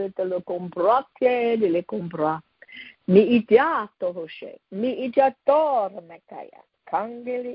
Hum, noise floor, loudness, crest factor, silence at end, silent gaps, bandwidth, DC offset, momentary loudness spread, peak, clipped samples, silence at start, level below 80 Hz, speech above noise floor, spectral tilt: none; -45 dBFS; -22 LUFS; 20 dB; 0 s; none; 5.4 kHz; under 0.1%; 22 LU; -4 dBFS; under 0.1%; 0 s; -66 dBFS; 22 dB; -11 dB/octave